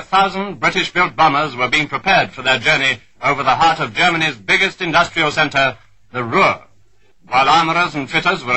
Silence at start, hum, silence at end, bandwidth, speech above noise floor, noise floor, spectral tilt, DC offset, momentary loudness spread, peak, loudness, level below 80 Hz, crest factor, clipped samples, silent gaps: 0 s; none; 0 s; 10.5 kHz; 41 dB; -57 dBFS; -3.5 dB/octave; 0.4%; 6 LU; -2 dBFS; -15 LUFS; -44 dBFS; 14 dB; under 0.1%; none